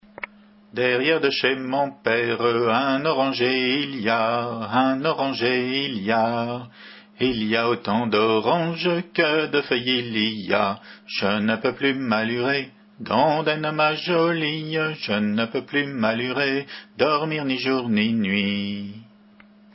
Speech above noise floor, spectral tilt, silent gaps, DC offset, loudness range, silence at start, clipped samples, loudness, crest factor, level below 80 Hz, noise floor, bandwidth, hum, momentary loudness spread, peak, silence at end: 29 dB; -9 dB/octave; none; under 0.1%; 2 LU; 0.2 s; under 0.1%; -22 LUFS; 20 dB; -62 dBFS; -51 dBFS; 5.8 kHz; none; 6 LU; -2 dBFS; 0.7 s